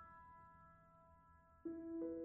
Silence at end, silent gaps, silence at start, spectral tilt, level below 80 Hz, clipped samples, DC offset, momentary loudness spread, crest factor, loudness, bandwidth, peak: 0 s; none; 0 s; -4.5 dB/octave; -76 dBFS; under 0.1%; under 0.1%; 21 LU; 16 dB; -53 LUFS; 2.3 kHz; -38 dBFS